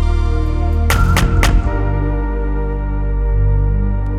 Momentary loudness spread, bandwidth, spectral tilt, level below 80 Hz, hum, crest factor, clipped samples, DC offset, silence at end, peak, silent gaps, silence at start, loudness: 7 LU; 15 kHz; -6 dB/octave; -16 dBFS; none; 14 dB; under 0.1%; under 0.1%; 0 s; 0 dBFS; none; 0 s; -17 LUFS